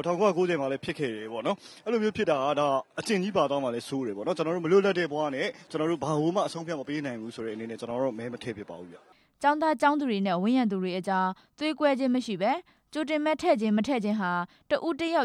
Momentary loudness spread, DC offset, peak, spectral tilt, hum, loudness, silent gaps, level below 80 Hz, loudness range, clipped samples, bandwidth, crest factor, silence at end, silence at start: 10 LU; under 0.1%; -10 dBFS; -6 dB/octave; none; -28 LUFS; none; -68 dBFS; 4 LU; under 0.1%; 12.5 kHz; 18 dB; 0 s; 0 s